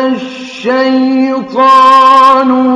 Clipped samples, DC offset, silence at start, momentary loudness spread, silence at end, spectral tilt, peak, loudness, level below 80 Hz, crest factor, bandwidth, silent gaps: 4%; under 0.1%; 0 s; 13 LU; 0 s; -4.5 dB/octave; 0 dBFS; -7 LUFS; -54 dBFS; 8 dB; 11 kHz; none